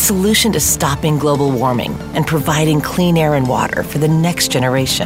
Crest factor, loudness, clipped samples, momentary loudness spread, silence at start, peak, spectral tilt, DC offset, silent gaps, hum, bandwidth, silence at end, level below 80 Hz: 12 dB; -14 LUFS; under 0.1%; 5 LU; 0 s; -2 dBFS; -4.5 dB/octave; under 0.1%; none; none; 16.5 kHz; 0 s; -34 dBFS